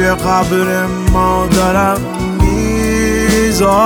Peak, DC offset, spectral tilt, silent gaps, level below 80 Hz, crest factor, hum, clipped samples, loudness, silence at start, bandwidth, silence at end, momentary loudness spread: 0 dBFS; under 0.1%; -5 dB/octave; none; -22 dBFS; 12 dB; none; under 0.1%; -13 LUFS; 0 s; over 20 kHz; 0 s; 4 LU